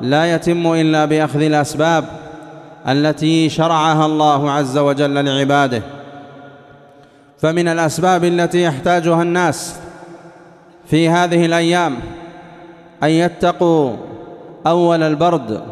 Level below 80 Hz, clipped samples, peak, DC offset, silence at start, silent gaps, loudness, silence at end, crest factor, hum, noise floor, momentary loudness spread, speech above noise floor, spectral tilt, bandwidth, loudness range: -52 dBFS; under 0.1%; -2 dBFS; under 0.1%; 0 s; none; -15 LUFS; 0 s; 14 dB; none; -46 dBFS; 19 LU; 31 dB; -5.5 dB/octave; 13.5 kHz; 3 LU